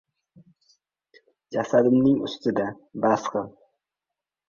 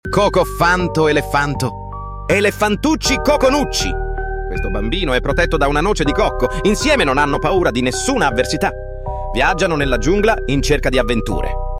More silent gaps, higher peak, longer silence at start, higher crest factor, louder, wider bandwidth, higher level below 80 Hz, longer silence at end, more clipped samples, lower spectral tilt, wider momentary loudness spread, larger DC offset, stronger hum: neither; second, -8 dBFS vs -2 dBFS; first, 1.5 s vs 0.05 s; about the same, 18 dB vs 14 dB; second, -24 LUFS vs -16 LUFS; second, 7.4 kHz vs 16 kHz; second, -64 dBFS vs -24 dBFS; first, 1 s vs 0 s; neither; first, -6.5 dB/octave vs -4.5 dB/octave; first, 13 LU vs 9 LU; neither; neither